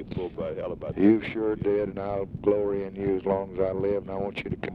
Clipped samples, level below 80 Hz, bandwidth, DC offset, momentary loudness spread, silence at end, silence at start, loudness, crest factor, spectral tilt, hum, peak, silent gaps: under 0.1%; -50 dBFS; 5.2 kHz; under 0.1%; 10 LU; 0 s; 0 s; -27 LUFS; 18 dB; -9.5 dB/octave; none; -8 dBFS; none